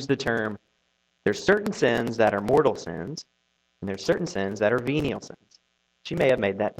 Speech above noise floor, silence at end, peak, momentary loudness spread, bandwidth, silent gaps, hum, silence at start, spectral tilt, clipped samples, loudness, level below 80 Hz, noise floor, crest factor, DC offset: 47 dB; 0.1 s; -6 dBFS; 14 LU; 14.5 kHz; none; none; 0 s; -5.5 dB/octave; under 0.1%; -25 LUFS; -56 dBFS; -71 dBFS; 20 dB; under 0.1%